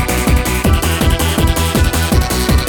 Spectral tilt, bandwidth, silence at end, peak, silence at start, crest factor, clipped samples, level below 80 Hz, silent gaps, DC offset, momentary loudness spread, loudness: -4.5 dB/octave; 19.5 kHz; 0 s; 0 dBFS; 0 s; 12 dB; under 0.1%; -16 dBFS; none; under 0.1%; 1 LU; -14 LUFS